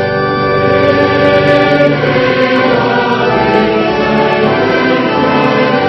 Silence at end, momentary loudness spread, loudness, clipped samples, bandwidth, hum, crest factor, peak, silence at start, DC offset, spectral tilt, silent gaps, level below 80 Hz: 0 s; 3 LU; -10 LUFS; 0.2%; 7.4 kHz; none; 10 dB; 0 dBFS; 0 s; under 0.1%; -7 dB/octave; none; -40 dBFS